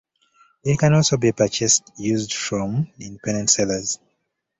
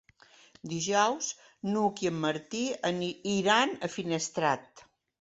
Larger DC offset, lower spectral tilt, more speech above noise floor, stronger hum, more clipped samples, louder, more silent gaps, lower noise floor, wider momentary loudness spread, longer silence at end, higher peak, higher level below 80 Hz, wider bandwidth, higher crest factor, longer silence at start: neither; about the same, -4 dB/octave vs -3.5 dB/octave; first, 54 dB vs 30 dB; neither; neither; first, -20 LUFS vs -30 LUFS; neither; first, -74 dBFS vs -59 dBFS; about the same, 12 LU vs 10 LU; first, 0.65 s vs 0.4 s; first, -2 dBFS vs -10 dBFS; first, -52 dBFS vs -70 dBFS; about the same, 8.2 kHz vs 8.2 kHz; about the same, 18 dB vs 20 dB; about the same, 0.65 s vs 0.65 s